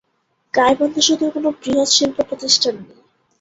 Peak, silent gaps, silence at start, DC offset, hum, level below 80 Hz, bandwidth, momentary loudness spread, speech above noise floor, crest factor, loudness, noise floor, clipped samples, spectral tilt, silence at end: -2 dBFS; none; 0.55 s; under 0.1%; none; -56 dBFS; 8.2 kHz; 8 LU; 50 dB; 18 dB; -16 LUFS; -67 dBFS; under 0.1%; -1.5 dB/octave; 0.55 s